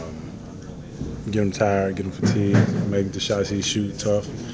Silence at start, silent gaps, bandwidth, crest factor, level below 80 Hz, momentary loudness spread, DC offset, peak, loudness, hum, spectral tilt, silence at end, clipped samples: 0 s; none; 8 kHz; 18 dB; -44 dBFS; 17 LU; under 0.1%; -4 dBFS; -23 LUFS; none; -5.5 dB/octave; 0 s; under 0.1%